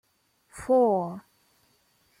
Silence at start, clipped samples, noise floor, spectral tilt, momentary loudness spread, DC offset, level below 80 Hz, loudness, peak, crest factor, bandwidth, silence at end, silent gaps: 0.55 s; under 0.1%; -68 dBFS; -7.5 dB/octave; 23 LU; under 0.1%; -64 dBFS; -25 LUFS; -12 dBFS; 16 dB; 12.5 kHz; 1 s; none